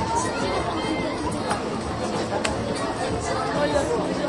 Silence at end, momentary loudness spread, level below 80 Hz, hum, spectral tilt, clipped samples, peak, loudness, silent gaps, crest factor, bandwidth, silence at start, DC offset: 0 s; 4 LU; -42 dBFS; none; -4.5 dB/octave; under 0.1%; -6 dBFS; -25 LUFS; none; 20 dB; 11.5 kHz; 0 s; under 0.1%